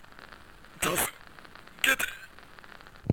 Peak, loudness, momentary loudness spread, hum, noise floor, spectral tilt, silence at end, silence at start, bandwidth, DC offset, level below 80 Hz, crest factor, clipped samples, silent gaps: -6 dBFS; -28 LUFS; 24 LU; none; -51 dBFS; -2.5 dB/octave; 0 s; 0.2 s; 18 kHz; 0.2%; -54 dBFS; 28 dB; under 0.1%; none